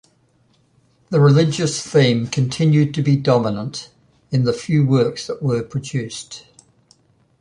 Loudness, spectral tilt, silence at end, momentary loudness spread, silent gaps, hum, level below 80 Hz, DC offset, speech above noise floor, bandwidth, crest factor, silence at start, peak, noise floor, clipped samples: -18 LUFS; -6.5 dB/octave; 1 s; 13 LU; none; none; -54 dBFS; under 0.1%; 42 dB; 10.5 kHz; 18 dB; 1.1 s; -2 dBFS; -59 dBFS; under 0.1%